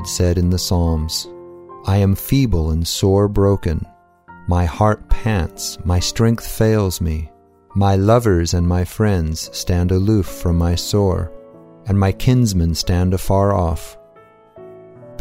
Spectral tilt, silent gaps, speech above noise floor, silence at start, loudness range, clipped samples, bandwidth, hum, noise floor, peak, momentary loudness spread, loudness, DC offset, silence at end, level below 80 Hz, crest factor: -6 dB/octave; none; 31 dB; 0 s; 2 LU; under 0.1%; 16 kHz; none; -47 dBFS; 0 dBFS; 10 LU; -18 LUFS; under 0.1%; 0 s; -28 dBFS; 16 dB